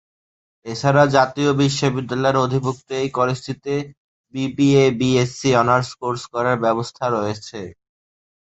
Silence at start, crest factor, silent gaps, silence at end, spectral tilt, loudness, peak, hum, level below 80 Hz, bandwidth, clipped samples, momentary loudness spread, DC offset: 0.65 s; 18 dB; 3.97-4.24 s; 0.75 s; -6 dB/octave; -19 LUFS; -2 dBFS; none; -54 dBFS; 8.2 kHz; under 0.1%; 14 LU; under 0.1%